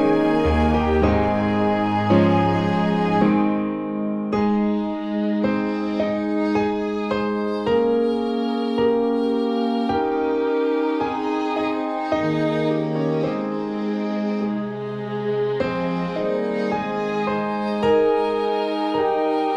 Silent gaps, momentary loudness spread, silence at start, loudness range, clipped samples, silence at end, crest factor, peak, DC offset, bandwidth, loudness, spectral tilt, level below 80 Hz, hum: none; 6 LU; 0 s; 5 LU; under 0.1%; 0 s; 16 dB; -4 dBFS; under 0.1%; 9 kHz; -21 LUFS; -8 dB/octave; -40 dBFS; none